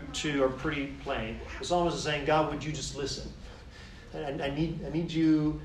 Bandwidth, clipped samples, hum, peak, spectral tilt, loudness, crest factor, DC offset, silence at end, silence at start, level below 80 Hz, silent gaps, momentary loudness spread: 11 kHz; under 0.1%; none; -14 dBFS; -5 dB/octave; -31 LUFS; 18 dB; under 0.1%; 0 s; 0 s; -46 dBFS; none; 18 LU